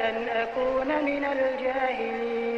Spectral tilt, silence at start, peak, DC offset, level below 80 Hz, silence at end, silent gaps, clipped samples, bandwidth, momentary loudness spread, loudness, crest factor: -5.5 dB/octave; 0 s; -16 dBFS; under 0.1%; -56 dBFS; 0 s; none; under 0.1%; 7.4 kHz; 3 LU; -27 LUFS; 12 dB